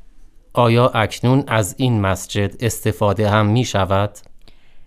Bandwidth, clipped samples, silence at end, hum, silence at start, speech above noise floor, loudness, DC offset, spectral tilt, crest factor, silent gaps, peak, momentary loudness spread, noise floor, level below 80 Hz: 15.5 kHz; under 0.1%; 0 s; none; 0.15 s; 24 dB; -18 LUFS; under 0.1%; -6 dB/octave; 16 dB; none; -2 dBFS; 6 LU; -41 dBFS; -44 dBFS